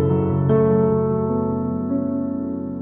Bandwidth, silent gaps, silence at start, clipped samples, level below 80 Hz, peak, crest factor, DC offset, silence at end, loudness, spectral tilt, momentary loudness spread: 3.4 kHz; none; 0 s; under 0.1%; -50 dBFS; -4 dBFS; 14 dB; under 0.1%; 0 s; -20 LUFS; -13.5 dB/octave; 8 LU